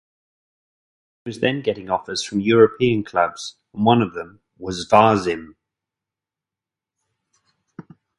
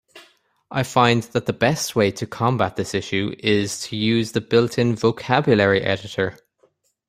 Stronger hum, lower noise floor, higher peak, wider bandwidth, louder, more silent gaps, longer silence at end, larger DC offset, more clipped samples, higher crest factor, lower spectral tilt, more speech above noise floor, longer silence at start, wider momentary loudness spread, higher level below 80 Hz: neither; first, -88 dBFS vs -63 dBFS; about the same, 0 dBFS vs -2 dBFS; second, 11.5 kHz vs 16 kHz; about the same, -19 LUFS vs -20 LUFS; neither; second, 0.4 s vs 0.75 s; neither; neither; about the same, 22 dB vs 20 dB; about the same, -5.5 dB/octave vs -5 dB/octave; first, 69 dB vs 43 dB; first, 1.25 s vs 0.15 s; first, 19 LU vs 8 LU; about the same, -56 dBFS vs -56 dBFS